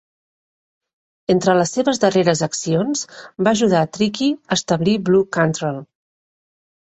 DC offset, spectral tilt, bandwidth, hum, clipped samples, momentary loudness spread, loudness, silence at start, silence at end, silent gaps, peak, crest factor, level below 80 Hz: under 0.1%; -5 dB/octave; 8.4 kHz; none; under 0.1%; 9 LU; -18 LUFS; 1.3 s; 1 s; none; -2 dBFS; 18 dB; -56 dBFS